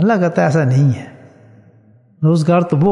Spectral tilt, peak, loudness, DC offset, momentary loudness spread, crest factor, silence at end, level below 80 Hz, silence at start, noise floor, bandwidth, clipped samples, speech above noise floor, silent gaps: -8.5 dB/octave; 0 dBFS; -15 LUFS; under 0.1%; 8 LU; 14 dB; 0 s; -52 dBFS; 0 s; -49 dBFS; 11 kHz; under 0.1%; 36 dB; none